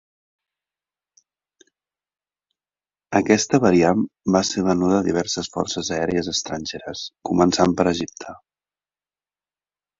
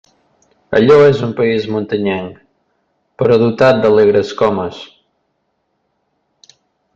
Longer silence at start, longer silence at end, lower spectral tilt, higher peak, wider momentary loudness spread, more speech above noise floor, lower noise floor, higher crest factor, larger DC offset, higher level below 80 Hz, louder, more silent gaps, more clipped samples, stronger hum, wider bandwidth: first, 3.1 s vs 0.7 s; second, 1.65 s vs 2.1 s; second, -4.5 dB/octave vs -7 dB/octave; about the same, -2 dBFS vs 0 dBFS; about the same, 14 LU vs 13 LU; first, over 70 dB vs 55 dB; first, under -90 dBFS vs -67 dBFS; first, 20 dB vs 14 dB; neither; about the same, -50 dBFS vs -52 dBFS; second, -20 LUFS vs -13 LUFS; neither; neither; neither; about the same, 7.8 kHz vs 7.4 kHz